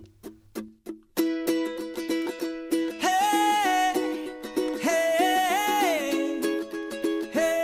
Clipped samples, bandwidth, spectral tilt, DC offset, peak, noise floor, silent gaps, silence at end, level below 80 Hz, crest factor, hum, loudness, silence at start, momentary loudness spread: under 0.1%; 16.5 kHz; -2.5 dB/octave; under 0.1%; -12 dBFS; -47 dBFS; none; 0 s; -64 dBFS; 14 dB; none; -26 LUFS; 0 s; 12 LU